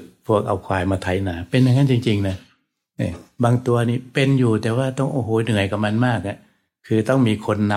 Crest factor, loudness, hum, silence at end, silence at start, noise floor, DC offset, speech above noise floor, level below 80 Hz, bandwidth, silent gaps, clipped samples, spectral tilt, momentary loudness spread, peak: 16 dB; -20 LUFS; none; 0 s; 0 s; -64 dBFS; under 0.1%; 45 dB; -50 dBFS; 12.5 kHz; none; under 0.1%; -7 dB/octave; 10 LU; -4 dBFS